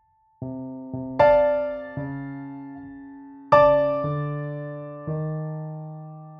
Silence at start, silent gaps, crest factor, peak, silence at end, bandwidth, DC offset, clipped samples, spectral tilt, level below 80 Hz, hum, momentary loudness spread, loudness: 0.4 s; none; 22 dB; -2 dBFS; 0 s; 5.8 kHz; under 0.1%; under 0.1%; -9 dB/octave; -52 dBFS; none; 22 LU; -23 LUFS